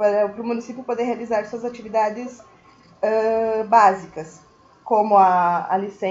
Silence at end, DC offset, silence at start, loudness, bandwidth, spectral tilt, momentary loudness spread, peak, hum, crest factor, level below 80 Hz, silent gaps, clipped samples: 0 s; under 0.1%; 0 s; -20 LUFS; 7.8 kHz; -6 dB/octave; 15 LU; -2 dBFS; none; 18 dB; -62 dBFS; none; under 0.1%